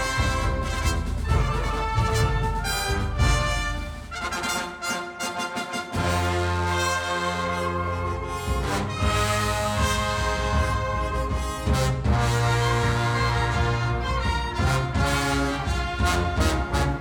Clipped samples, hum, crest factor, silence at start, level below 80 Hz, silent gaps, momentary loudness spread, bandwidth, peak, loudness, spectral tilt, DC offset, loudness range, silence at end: under 0.1%; none; 16 dB; 0 s; -30 dBFS; none; 6 LU; over 20 kHz; -8 dBFS; -25 LUFS; -4.5 dB/octave; under 0.1%; 3 LU; 0 s